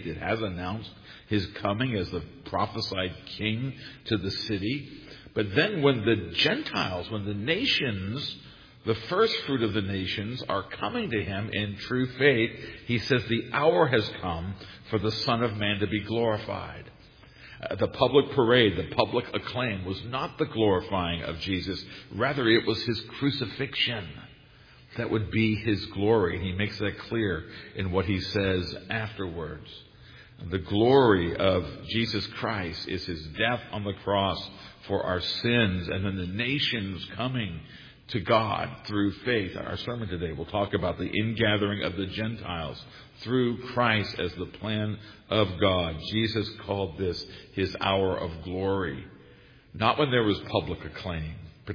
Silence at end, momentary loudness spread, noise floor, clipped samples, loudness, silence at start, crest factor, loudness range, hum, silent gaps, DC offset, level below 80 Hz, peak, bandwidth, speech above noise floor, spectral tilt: 0 s; 12 LU; -54 dBFS; under 0.1%; -28 LUFS; 0 s; 24 dB; 4 LU; none; none; under 0.1%; -52 dBFS; -4 dBFS; 5.2 kHz; 26 dB; -7 dB/octave